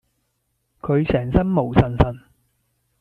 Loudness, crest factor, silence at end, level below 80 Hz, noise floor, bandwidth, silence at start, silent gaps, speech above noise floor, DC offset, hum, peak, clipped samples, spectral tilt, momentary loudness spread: -20 LUFS; 20 dB; 0.8 s; -32 dBFS; -72 dBFS; 5.4 kHz; 0.85 s; none; 53 dB; under 0.1%; none; -2 dBFS; under 0.1%; -10 dB/octave; 9 LU